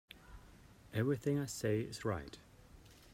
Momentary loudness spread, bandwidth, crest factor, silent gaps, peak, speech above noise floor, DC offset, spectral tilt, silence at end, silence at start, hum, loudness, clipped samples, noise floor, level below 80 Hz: 23 LU; 16 kHz; 18 dB; none; -24 dBFS; 23 dB; under 0.1%; -6 dB/octave; 0.05 s; 0.15 s; none; -38 LUFS; under 0.1%; -60 dBFS; -62 dBFS